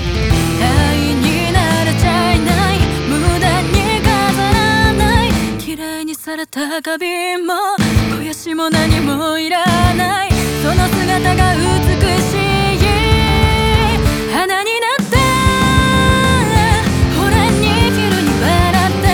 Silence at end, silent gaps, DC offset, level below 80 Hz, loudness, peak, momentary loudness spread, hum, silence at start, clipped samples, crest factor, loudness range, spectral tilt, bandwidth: 0 s; none; under 0.1%; -24 dBFS; -13 LUFS; -2 dBFS; 6 LU; none; 0 s; under 0.1%; 12 dB; 4 LU; -5 dB/octave; over 20 kHz